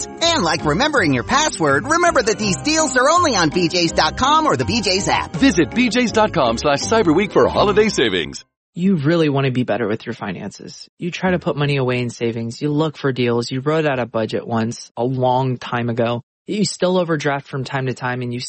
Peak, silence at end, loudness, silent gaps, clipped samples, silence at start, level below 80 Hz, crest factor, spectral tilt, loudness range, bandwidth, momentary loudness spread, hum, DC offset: -2 dBFS; 0 s; -18 LUFS; 8.57-8.73 s, 10.89-10.97 s, 14.91-14.95 s, 16.23-16.45 s; under 0.1%; 0 s; -42 dBFS; 14 dB; -4.5 dB/octave; 5 LU; 8.8 kHz; 9 LU; none; under 0.1%